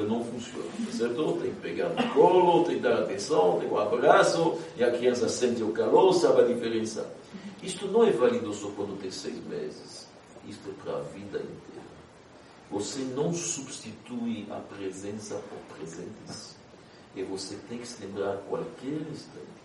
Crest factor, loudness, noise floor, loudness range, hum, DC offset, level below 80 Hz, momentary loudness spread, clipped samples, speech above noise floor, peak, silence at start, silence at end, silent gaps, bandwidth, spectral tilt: 24 dB; -27 LUFS; -52 dBFS; 15 LU; none; under 0.1%; -68 dBFS; 20 LU; under 0.1%; 24 dB; -4 dBFS; 0 s; 0.05 s; none; 11.5 kHz; -4.5 dB/octave